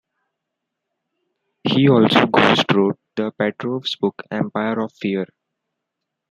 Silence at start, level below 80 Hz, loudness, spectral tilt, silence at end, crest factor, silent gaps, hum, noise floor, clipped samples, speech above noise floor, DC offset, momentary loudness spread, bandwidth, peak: 1.65 s; -62 dBFS; -18 LUFS; -6.5 dB/octave; 1.05 s; 20 dB; none; none; -80 dBFS; under 0.1%; 62 dB; under 0.1%; 12 LU; 12 kHz; -2 dBFS